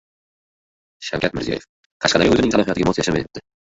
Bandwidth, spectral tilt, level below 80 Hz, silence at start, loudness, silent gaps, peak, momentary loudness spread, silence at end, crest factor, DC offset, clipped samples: 8 kHz; -4.5 dB/octave; -44 dBFS; 1 s; -19 LUFS; 1.69-2.00 s; -2 dBFS; 13 LU; 0.3 s; 18 dB; under 0.1%; under 0.1%